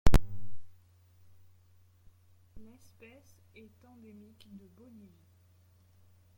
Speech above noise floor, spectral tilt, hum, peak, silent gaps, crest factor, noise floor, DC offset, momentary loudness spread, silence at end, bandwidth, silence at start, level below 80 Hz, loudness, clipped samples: 9 dB; -6 dB/octave; none; -8 dBFS; none; 22 dB; -64 dBFS; under 0.1%; 15 LU; 3.8 s; 16.5 kHz; 0.05 s; -40 dBFS; -38 LUFS; under 0.1%